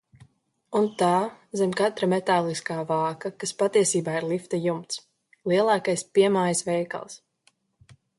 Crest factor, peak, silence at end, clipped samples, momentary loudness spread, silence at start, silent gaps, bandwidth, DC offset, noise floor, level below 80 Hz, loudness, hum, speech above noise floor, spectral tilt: 18 dB; -8 dBFS; 1.05 s; under 0.1%; 11 LU; 0.7 s; none; 11.5 kHz; under 0.1%; -66 dBFS; -70 dBFS; -25 LUFS; none; 42 dB; -4.5 dB/octave